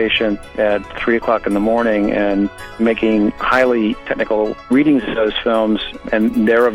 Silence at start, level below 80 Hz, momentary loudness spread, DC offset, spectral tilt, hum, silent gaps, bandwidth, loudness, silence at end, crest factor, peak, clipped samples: 0 s; -40 dBFS; 6 LU; under 0.1%; -6.5 dB/octave; none; none; 13 kHz; -16 LUFS; 0 s; 12 dB; -2 dBFS; under 0.1%